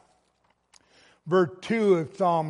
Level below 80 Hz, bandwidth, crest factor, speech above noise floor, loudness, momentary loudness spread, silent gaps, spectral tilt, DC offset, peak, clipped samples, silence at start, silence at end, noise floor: -74 dBFS; 10.5 kHz; 18 dB; 46 dB; -25 LUFS; 4 LU; none; -7 dB/octave; under 0.1%; -10 dBFS; under 0.1%; 1.25 s; 0 s; -69 dBFS